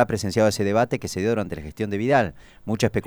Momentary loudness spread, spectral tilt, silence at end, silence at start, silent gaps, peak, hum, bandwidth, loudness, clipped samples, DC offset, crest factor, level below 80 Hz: 10 LU; -5.5 dB/octave; 0 s; 0 s; none; -4 dBFS; none; over 20 kHz; -23 LUFS; under 0.1%; under 0.1%; 18 dB; -48 dBFS